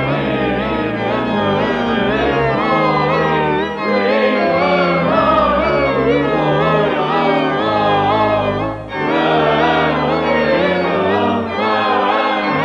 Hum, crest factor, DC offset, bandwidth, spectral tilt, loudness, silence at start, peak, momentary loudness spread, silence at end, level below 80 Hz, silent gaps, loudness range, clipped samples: none; 12 dB; under 0.1%; 8.8 kHz; -7 dB/octave; -15 LUFS; 0 s; -4 dBFS; 4 LU; 0 s; -40 dBFS; none; 2 LU; under 0.1%